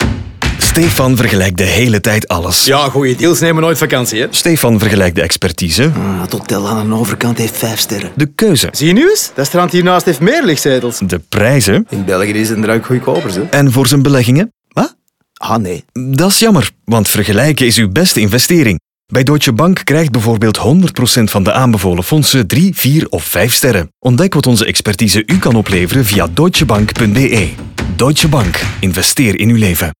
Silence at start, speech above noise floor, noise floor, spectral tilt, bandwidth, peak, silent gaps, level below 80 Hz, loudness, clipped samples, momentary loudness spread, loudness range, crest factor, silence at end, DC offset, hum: 0 s; 38 dB; -48 dBFS; -4.5 dB/octave; 19.5 kHz; 0 dBFS; none; -32 dBFS; -11 LUFS; under 0.1%; 7 LU; 2 LU; 10 dB; 0.05 s; under 0.1%; none